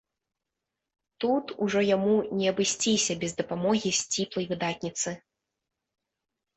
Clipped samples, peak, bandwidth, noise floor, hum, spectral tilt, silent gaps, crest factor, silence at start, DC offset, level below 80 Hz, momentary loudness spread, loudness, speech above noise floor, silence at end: under 0.1%; -12 dBFS; 8.4 kHz; -86 dBFS; none; -3.5 dB/octave; none; 18 dB; 1.2 s; under 0.1%; -66 dBFS; 7 LU; -27 LUFS; 59 dB; 1.4 s